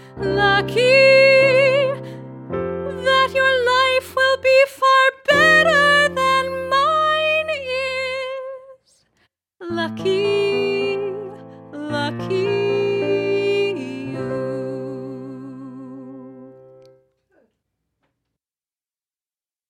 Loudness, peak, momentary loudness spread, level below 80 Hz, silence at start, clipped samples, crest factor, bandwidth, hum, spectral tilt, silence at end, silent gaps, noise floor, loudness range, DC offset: -17 LUFS; -2 dBFS; 21 LU; -54 dBFS; 0 s; under 0.1%; 16 dB; 15.5 kHz; none; -4.5 dB/octave; 3.2 s; none; under -90 dBFS; 13 LU; under 0.1%